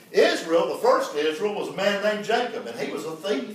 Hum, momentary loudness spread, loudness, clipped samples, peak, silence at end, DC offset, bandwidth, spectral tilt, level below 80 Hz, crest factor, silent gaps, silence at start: none; 10 LU; -24 LUFS; under 0.1%; -6 dBFS; 0 s; under 0.1%; 16 kHz; -3.5 dB/octave; -82 dBFS; 18 dB; none; 0.1 s